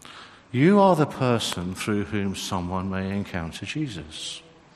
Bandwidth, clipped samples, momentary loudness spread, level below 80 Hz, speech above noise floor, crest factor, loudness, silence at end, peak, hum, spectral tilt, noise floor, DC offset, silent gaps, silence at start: 13 kHz; under 0.1%; 15 LU; -56 dBFS; 22 dB; 20 dB; -25 LUFS; 0.35 s; -6 dBFS; none; -5.5 dB/octave; -46 dBFS; under 0.1%; none; 0.05 s